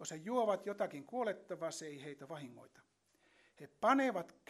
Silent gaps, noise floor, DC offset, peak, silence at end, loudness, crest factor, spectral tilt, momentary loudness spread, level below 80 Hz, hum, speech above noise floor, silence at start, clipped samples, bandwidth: none; -73 dBFS; under 0.1%; -18 dBFS; 0.2 s; -38 LUFS; 22 dB; -4.5 dB/octave; 17 LU; -90 dBFS; none; 34 dB; 0 s; under 0.1%; 13 kHz